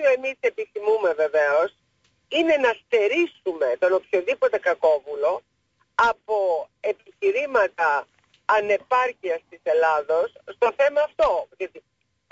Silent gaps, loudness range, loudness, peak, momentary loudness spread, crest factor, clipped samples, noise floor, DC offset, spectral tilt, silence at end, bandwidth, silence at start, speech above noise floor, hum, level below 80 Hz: none; 2 LU; -23 LUFS; -8 dBFS; 9 LU; 16 dB; under 0.1%; -69 dBFS; under 0.1%; -3.5 dB/octave; 0.5 s; 7.8 kHz; 0 s; 47 dB; none; -62 dBFS